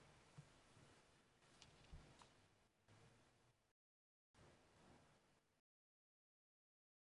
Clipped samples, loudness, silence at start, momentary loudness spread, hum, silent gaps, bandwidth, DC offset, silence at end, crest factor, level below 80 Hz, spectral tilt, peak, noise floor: under 0.1%; -68 LUFS; 0 s; 3 LU; none; 3.71-4.34 s; 11 kHz; under 0.1%; 1.6 s; 28 dB; -80 dBFS; -4 dB/octave; -44 dBFS; under -90 dBFS